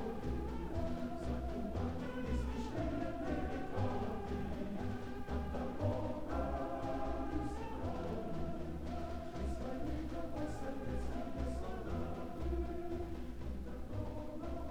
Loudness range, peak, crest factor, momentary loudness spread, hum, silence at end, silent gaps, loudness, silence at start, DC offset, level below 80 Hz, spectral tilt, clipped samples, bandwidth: 2 LU; -24 dBFS; 16 dB; 5 LU; none; 0 s; none; -42 LUFS; 0 s; 0.4%; -46 dBFS; -7.5 dB/octave; under 0.1%; 14.5 kHz